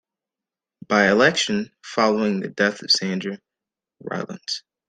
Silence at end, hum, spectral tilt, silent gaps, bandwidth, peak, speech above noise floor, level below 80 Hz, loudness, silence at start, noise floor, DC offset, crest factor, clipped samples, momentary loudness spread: 0.3 s; none; -3.5 dB/octave; none; 9.6 kHz; -2 dBFS; 67 dB; -64 dBFS; -21 LUFS; 0.9 s; -89 dBFS; under 0.1%; 20 dB; under 0.1%; 14 LU